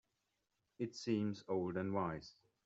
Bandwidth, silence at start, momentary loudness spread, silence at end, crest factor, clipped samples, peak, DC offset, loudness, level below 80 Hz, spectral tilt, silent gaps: 8 kHz; 0.8 s; 9 LU; 0.35 s; 18 dB; under 0.1%; -24 dBFS; under 0.1%; -41 LUFS; -76 dBFS; -6 dB/octave; none